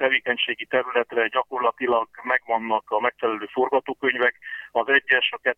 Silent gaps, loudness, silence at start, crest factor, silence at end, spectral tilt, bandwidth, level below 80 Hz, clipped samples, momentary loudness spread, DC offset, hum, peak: none; -23 LUFS; 0 s; 18 dB; 0.05 s; -5 dB/octave; 4.5 kHz; -70 dBFS; under 0.1%; 5 LU; under 0.1%; none; -6 dBFS